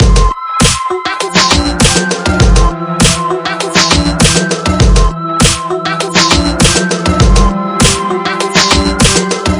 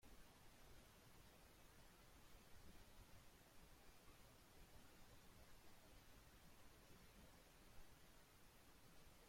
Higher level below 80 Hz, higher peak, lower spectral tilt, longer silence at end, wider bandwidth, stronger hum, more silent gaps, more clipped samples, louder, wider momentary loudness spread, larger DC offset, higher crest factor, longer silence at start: first, -16 dBFS vs -72 dBFS; first, 0 dBFS vs -50 dBFS; about the same, -3.5 dB/octave vs -3.5 dB/octave; about the same, 0 s vs 0 s; second, 12 kHz vs 16.5 kHz; neither; neither; first, 0.6% vs under 0.1%; first, -10 LUFS vs -69 LUFS; first, 6 LU vs 1 LU; neither; second, 10 dB vs 16 dB; about the same, 0 s vs 0 s